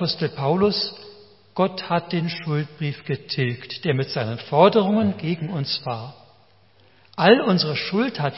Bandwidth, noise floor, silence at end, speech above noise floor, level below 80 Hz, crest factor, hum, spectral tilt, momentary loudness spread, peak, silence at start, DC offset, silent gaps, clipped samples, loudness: 6 kHz; -57 dBFS; 0 s; 35 dB; -62 dBFS; 22 dB; none; -9.5 dB/octave; 13 LU; -2 dBFS; 0 s; 0.1%; none; under 0.1%; -22 LUFS